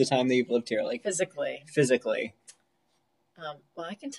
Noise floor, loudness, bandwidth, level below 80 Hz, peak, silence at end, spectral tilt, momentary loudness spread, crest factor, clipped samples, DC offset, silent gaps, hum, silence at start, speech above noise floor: -74 dBFS; -28 LUFS; 12 kHz; -78 dBFS; -10 dBFS; 0 s; -4.5 dB/octave; 16 LU; 20 dB; under 0.1%; under 0.1%; none; none; 0 s; 45 dB